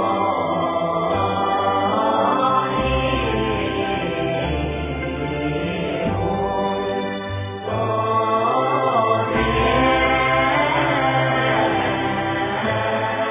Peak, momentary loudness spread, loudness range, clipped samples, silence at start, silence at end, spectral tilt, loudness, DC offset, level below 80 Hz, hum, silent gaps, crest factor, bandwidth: -6 dBFS; 7 LU; 5 LU; under 0.1%; 0 s; 0 s; -9.5 dB/octave; -20 LUFS; under 0.1%; -36 dBFS; none; none; 14 dB; 3.8 kHz